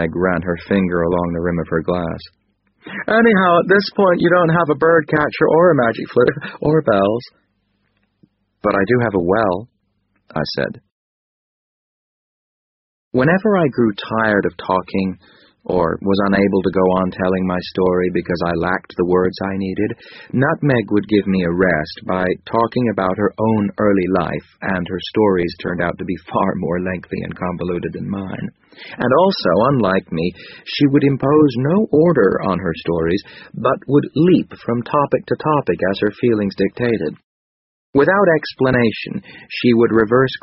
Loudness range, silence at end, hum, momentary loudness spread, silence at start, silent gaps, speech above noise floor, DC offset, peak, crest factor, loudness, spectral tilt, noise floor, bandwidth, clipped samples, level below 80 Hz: 6 LU; 0.05 s; none; 11 LU; 0 s; 10.92-13.11 s, 37.24-37.93 s; 49 dB; under 0.1%; 0 dBFS; 16 dB; -17 LUFS; -5.5 dB/octave; -66 dBFS; 6 kHz; under 0.1%; -46 dBFS